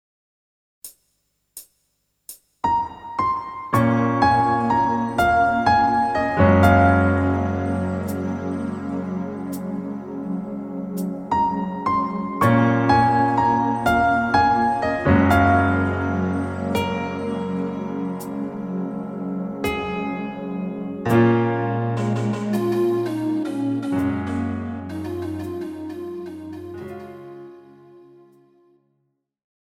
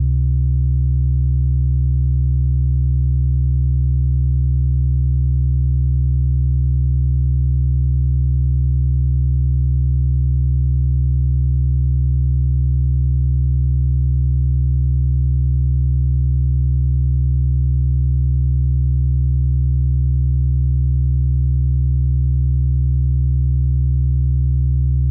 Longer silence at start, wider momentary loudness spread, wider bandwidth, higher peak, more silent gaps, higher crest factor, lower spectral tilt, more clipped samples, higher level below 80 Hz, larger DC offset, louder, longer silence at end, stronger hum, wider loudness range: first, 0.85 s vs 0 s; first, 15 LU vs 0 LU; first, 18.5 kHz vs 0.6 kHz; first, -2 dBFS vs -10 dBFS; neither; first, 20 dB vs 6 dB; second, -7.5 dB/octave vs -22.5 dB/octave; neither; second, -46 dBFS vs -16 dBFS; neither; second, -21 LUFS vs -18 LUFS; first, 1.65 s vs 0 s; neither; first, 12 LU vs 0 LU